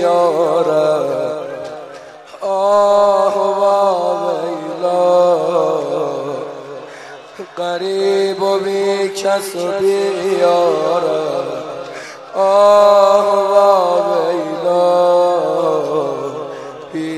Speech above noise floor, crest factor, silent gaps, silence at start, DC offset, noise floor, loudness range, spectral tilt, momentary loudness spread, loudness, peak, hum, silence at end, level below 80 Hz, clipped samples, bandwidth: 21 dB; 14 dB; none; 0 s; under 0.1%; -35 dBFS; 6 LU; -5 dB/octave; 17 LU; -14 LUFS; 0 dBFS; none; 0 s; -66 dBFS; under 0.1%; 13 kHz